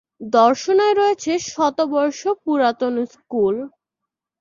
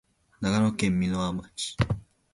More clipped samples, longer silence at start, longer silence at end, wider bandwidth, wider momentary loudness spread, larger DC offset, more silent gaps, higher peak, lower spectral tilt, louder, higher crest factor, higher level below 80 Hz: neither; second, 0.2 s vs 0.4 s; first, 0.75 s vs 0.3 s; second, 7.4 kHz vs 11.5 kHz; about the same, 9 LU vs 8 LU; neither; neither; first, -2 dBFS vs -6 dBFS; second, -4 dB/octave vs -5.5 dB/octave; first, -19 LUFS vs -28 LUFS; about the same, 18 dB vs 22 dB; second, -66 dBFS vs -46 dBFS